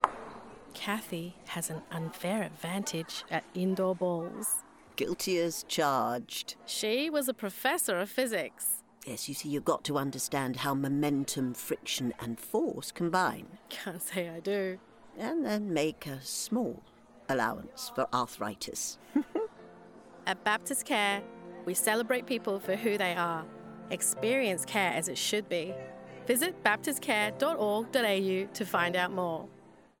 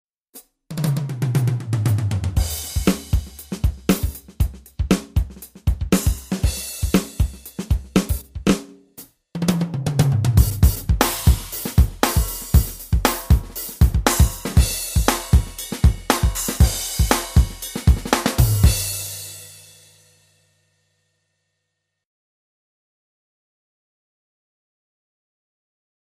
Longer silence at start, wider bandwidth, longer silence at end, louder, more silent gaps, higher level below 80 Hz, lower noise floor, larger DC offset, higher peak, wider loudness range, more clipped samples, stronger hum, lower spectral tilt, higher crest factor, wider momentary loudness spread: second, 0 s vs 0.35 s; first, over 20 kHz vs 16 kHz; second, 0.3 s vs 6.65 s; second, -32 LUFS vs -21 LUFS; neither; second, -70 dBFS vs -24 dBFS; second, -53 dBFS vs -78 dBFS; neither; second, -6 dBFS vs 0 dBFS; about the same, 4 LU vs 4 LU; neither; neither; second, -3.5 dB/octave vs -5 dB/octave; first, 26 dB vs 20 dB; first, 11 LU vs 8 LU